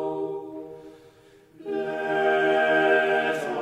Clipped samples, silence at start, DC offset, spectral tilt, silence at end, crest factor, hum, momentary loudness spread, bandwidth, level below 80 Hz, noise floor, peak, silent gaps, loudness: under 0.1%; 0 s; under 0.1%; -5 dB/octave; 0 s; 18 dB; none; 20 LU; 12.5 kHz; -70 dBFS; -54 dBFS; -8 dBFS; none; -23 LUFS